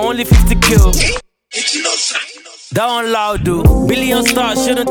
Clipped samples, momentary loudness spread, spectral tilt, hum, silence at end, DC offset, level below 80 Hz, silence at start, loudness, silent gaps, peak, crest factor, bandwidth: under 0.1%; 11 LU; -4 dB/octave; none; 0 s; under 0.1%; -18 dBFS; 0 s; -13 LUFS; none; 0 dBFS; 12 dB; 20 kHz